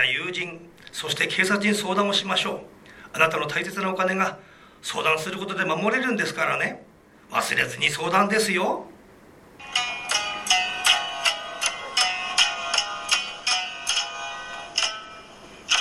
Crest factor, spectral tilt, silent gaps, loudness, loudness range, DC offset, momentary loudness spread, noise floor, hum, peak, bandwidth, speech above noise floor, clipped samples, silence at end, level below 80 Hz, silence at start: 22 dB; -2 dB/octave; none; -23 LUFS; 3 LU; under 0.1%; 13 LU; -50 dBFS; none; -2 dBFS; 16.5 kHz; 26 dB; under 0.1%; 0 s; -62 dBFS; 0 s